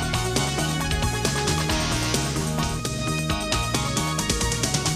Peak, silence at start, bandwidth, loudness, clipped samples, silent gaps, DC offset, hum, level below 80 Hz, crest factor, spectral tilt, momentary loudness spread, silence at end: -10 dBFS; 0 s; 15.5 kHz; -24 LUFS; under 0.1%; none; under 0.1%; none; -34 dBFS; 14 dB; -3.5 dB/octave; 3 LU; 0 s